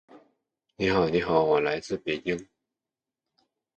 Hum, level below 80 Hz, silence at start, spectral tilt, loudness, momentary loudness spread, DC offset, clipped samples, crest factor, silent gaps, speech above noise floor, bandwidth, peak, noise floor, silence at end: none; -56 dBFS; 0.15 s; -6 dB/octave; -26 LUFS; 8 LU; under 0.1%; under 0.1%; 22 dB; none; 64 dB; 8.8 kHz; -8 dBFS; -90 dBFS; 1.35 s